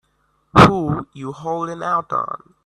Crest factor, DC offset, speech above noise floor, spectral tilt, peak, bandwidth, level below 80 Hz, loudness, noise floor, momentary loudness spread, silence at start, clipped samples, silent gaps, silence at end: 18 dB; under 0.1%; 47 dB; -6.5 dB/octave; 0 dBFS; 13 kHz; -44 dBFS; -17 LUFS; -64 dBFS; 17 LU; 0.55 s; under 0.1%; none; 0.3 s